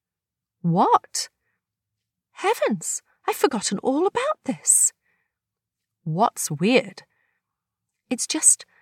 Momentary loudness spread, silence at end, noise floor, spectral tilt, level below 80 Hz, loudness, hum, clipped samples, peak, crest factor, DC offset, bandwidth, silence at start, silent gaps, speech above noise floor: 13 LU; 0.2 s; -88 dBFS; -3 dB/octave; -76 dBFS; -21 LUFS; none; under 0.1%; -4 dBFS; 20 dB; under 0.1%; 17.5 kHz; 0.65 s; none; 66 dB